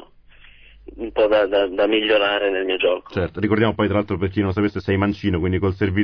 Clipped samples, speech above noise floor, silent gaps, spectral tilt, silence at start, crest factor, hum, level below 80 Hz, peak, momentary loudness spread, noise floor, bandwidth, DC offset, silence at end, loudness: under 0.1%; 28 dB; none; -8.5 dB/octave; 0.85 s; 16 dB; none; -44 dBFS; -4 dBFS; 6 LU; -48 dBFS; 5.4 kHz; 0.2%; 0 s; -20 LUFS